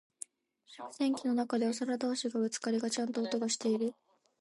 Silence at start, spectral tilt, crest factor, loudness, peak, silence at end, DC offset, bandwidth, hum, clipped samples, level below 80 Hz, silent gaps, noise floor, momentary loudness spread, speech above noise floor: 0.7 s; -3.5 dB/octave; 14 dB; -33 LUFS; -20 dBFS; 0.5 s; under 0.1%; 11.5 kHz; none; under 0.1%; -88 dBFS; none; -65 dBFS; 16 LU; 31 dB